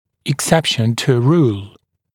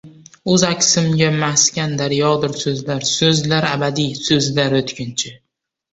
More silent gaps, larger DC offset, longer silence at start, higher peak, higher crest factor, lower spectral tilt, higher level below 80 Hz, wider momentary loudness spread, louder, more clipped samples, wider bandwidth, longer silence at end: neither; neither; first, 0.25 s vs 0.05 s; about the same, 0 dBFS vs -2 dBFS; about the same, 16 dB vs 16 dB; first, -5 dB/octave vs -3.5 dB/octave; about the same, -52 dBFS vs -52 dBFS; about the same, 8 LU vs 9 LU; about the same, -16 LUFS vs -16 LUFS; neither; first, 17.5 kHz vs 8.2 kHz; about the same, 0.45 s vs 0.55 s